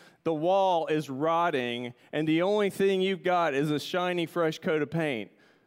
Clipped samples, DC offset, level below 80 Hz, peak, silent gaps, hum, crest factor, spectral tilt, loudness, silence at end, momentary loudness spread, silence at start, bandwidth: under 0.1%; under 0.1%; -76 dBFS; -14 dBFS; none; none; 14 dB; -6 dB/octave; -28 LUFS; 0.4 s; 7 LU; 0.25 s; 16 kHz